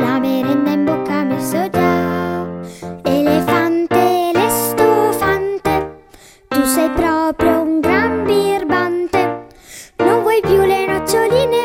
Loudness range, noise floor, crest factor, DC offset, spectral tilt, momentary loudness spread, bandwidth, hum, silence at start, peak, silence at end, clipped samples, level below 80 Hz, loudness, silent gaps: 2 LU; -44 dBFS; 16 dB; under 0.1%; -5 dB/octave; 8 LU; 16.5 kHz; none; 0 s; 0 dBFS; 0 s; under 0.1%; -42 dBFS; -15 LUFS; none